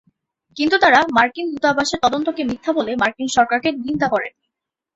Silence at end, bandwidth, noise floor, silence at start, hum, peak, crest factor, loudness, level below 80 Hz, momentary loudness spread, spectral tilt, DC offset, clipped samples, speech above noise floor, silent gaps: 0.65 s; 8.2 kHz; -81 dBFS; 0.55 s; none; -2 dBFS; 18 dB; -18 LUFS; -54 dBFS; 10 LU; -3.5 dB/octave; under 0.1%; under 0.1%; 63 dB; none